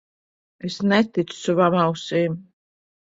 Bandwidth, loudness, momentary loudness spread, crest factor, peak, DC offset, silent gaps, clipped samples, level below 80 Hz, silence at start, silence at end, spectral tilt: 7.8 kHz; -21 LUFS; 13 LU; 18 dB; -4 dBFS; under 0.1%; none; under 0.1%; -64 dBFS; 0.65 s; 0.75 s; -6 dB/octave